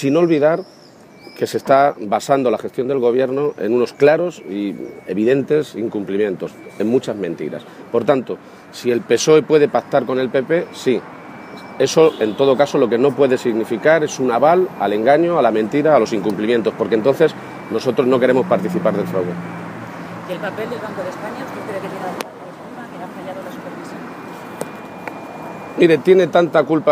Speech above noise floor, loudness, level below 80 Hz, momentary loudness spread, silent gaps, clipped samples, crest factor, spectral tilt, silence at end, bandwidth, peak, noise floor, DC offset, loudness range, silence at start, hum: 26 dB; -17 LUFS; -64 dBFS; 17 LU; none; under 0.1%; 18 dB; -5.5 dB/octave; 0 s; 15.5 kHz; 0 dBFS; -43 dBFS; under 0.1%; 12 LU; 0 s; none